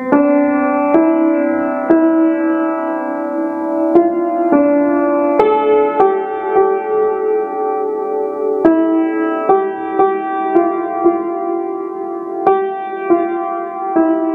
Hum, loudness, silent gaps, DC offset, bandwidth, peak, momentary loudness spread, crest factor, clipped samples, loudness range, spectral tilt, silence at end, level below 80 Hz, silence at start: none; -15 LUFS; none; under 0.1%; 3.7 kHz; 0 dBFS; 7 LU; 14 dB; under 0.1%; 3 LU; -8.5 dB/octave; 0 s; -56 dBFS; 0 s